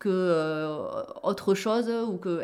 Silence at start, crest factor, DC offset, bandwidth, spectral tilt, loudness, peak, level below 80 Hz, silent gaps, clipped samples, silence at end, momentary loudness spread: 0 s; 14 dB; under 0.1%; 15 kHz; -6 dB/octave; -28 LUFS; -14 dBFS; -70 dBFS; none; under 0.1%; 0 s; 7 LU